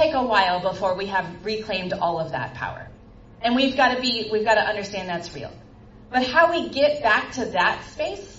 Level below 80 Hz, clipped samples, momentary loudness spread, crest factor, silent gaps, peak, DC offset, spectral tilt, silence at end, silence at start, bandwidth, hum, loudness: -52 dBFS; under 0.1%; 12 LU; 20 dB; none; -4 dBFS; under 0.1%; -4 dB/octave; 0 s; 0 s; 7.8 kHz; none; -22 LUFS